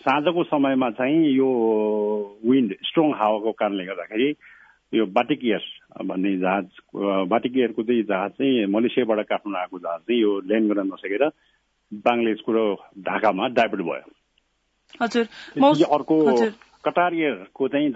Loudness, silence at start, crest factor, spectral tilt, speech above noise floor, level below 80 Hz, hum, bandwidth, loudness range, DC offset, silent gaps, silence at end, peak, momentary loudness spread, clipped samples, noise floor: -22 LUFS; 0.05 s; 16 dB; -6.5 dB/octave; 49 dB; -70 dBFS; none; 8 kHz; 3 LU; under 0.1%; none; 0 s; -6 dBFS; 9 LU; under 0.1%; -70 dBFS